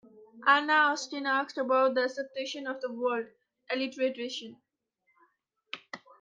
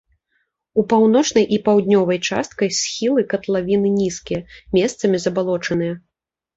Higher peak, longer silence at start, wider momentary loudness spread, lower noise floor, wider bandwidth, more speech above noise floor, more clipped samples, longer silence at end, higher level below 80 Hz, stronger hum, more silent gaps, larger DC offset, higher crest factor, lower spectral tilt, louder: second, -10 dBFS vs -4 dBFS; second, 0.15 s vs 0.75 s; first, 18 LU vs 8 LU; second, -76 dBFS vs -82 dBFS; first, 9 kHz vs 8 kHz; second, 47 dB vs 64 dB; neither; second, 0.25 s vs 0.6 s; second, -88 dBFS vs -52 dBFS; neither; neither; neither; first, 22 dB vs 16 dB; second, -2 dB/octave vs -5 dB/octave; second, -29 LUFS vs -18 LUFS